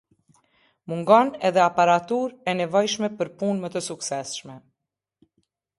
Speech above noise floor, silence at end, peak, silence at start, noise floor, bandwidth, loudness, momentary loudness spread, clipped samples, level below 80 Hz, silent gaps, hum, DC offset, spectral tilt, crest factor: 62 dB; 1.2 s; -4 dBFS; 0.9 s; -84 dBFS; 11.5 kHz; -23 LUFS; 12 LU; under 0.1%; -70 dBFS; none; none; under 0.1%; -4.5 dB/octave; 20 dB